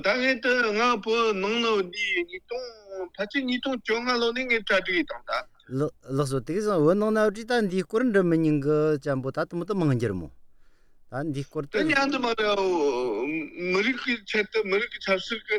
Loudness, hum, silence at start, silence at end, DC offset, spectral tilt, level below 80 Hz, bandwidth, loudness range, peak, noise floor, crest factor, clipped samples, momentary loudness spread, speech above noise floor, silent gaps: -25 LUFS; none; 0 s; 0 s; under 0.1%; -5.5 dB/octave; -56 dBFS; 13 kHz; 3 LU; -8 dBFS; -53 dBFS; 18 dB; under 0.1%; 9 LU; 27 dB; none